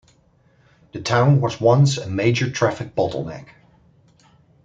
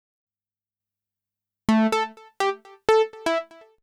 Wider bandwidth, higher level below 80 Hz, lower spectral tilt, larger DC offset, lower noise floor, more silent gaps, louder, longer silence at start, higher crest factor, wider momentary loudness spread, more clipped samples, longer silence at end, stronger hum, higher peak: second, 7.8 kHz vs 13.5 kHz; about the same, -56 dBFS vs -58 dBFS; about the same, -6 dB/octave vs -5 dB/octave; neither; second, -57 dBFS vs under -90 dBFS; neither; first, -19 LUFS vs -24 LUFS; second, 0.95 s vs 1.7 s; about the same, 18 dB vs 18 dB; first, 15 LU vs 8 LU; neither; first, 1.2 s vs 0.4 s; second, none vs 50 Hz at -60 dBFS; first, -2 dBFS vs -8 dBFS